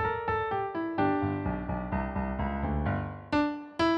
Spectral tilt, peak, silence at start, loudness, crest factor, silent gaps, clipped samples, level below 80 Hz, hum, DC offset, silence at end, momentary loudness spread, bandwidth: -8 dB/octave; -16 dBFS; 0 s; -31 LUFS; 14 dB; none; under 0.1%; -42 dBFS; none; under 0.1%; 0 s; 5 LU; 9 kHz